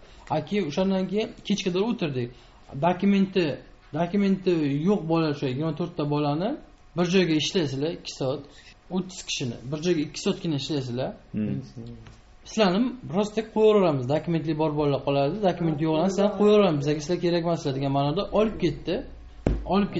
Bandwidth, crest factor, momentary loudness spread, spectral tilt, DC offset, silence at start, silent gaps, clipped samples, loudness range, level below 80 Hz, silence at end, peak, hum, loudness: 8 kHz; 20 dB; 10 LU; -5.5 dB/octave; under 0.1%; 0 s; none; under 0.1%; 6 LU; -46 dBFS; 0 s; -4 dBFS; none; -25 LUFS